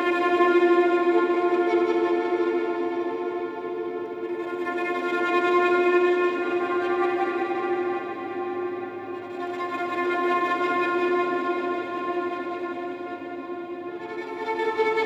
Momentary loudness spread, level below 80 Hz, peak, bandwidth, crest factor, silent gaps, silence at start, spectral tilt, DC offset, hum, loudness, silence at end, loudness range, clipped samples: 13 LU; -76 dBFS; -10 dBFS; 7.8 kHz; 16 dB; none; 0 s; -5.5 dB/octave; under 0.1%; none; -25 LUFS; 0 s; 5 LU; under 0.1%